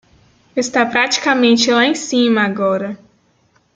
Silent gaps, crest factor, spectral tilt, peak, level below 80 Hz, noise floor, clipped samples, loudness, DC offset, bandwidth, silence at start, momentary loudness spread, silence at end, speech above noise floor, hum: none; 16 dB; -3 dB/octave; -2 dBFS; -62 dBFS; -58 dBFS; under 0.1%; -15 LUFS; under 0.1%; 9.2 kHz; 0.55 s; 11 LU; 0.8 s; 43 dB; none